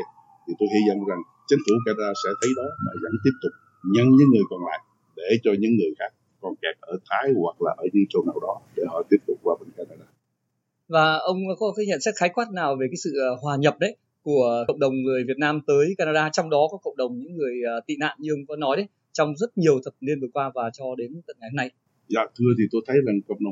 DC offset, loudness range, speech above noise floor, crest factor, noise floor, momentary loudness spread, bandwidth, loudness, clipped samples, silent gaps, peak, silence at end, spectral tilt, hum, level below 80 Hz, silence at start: under 0.1%; 4 LU; 53 dB; 20 dB; -76 dBFS; 11 LU; 8.2 kHz; -23 LUFS; under 0.1%; none; -4 dBFS; 0 s; -6 dB/octave; none; -76 dBFS; 0 s